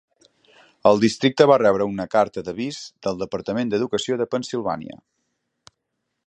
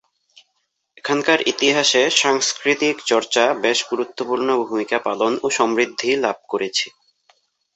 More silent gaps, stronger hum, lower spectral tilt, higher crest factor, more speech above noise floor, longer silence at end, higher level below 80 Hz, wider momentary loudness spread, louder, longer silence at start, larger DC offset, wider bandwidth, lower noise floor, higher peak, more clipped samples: neither; neither; first, -5.5 dB/octave vs -1.5 dB/octave; about the same, 22 dB vs 18 dB; first, 57 dB vs 53 dB; first, 1.3 s vs 0.85 s; first, -58 dBFS vs -68 dBFS; first, 13 LU vs 8 LU; about the same, -21 LUFS vs -19 LUFS; second, 0.85 s vs 1.05 s; neither; first, 10.5 kHz vs 8.4 kHz; first, -78 dBFS vs -72 dBFS; about the same, -2 dBFS vs -2 dBFS; neither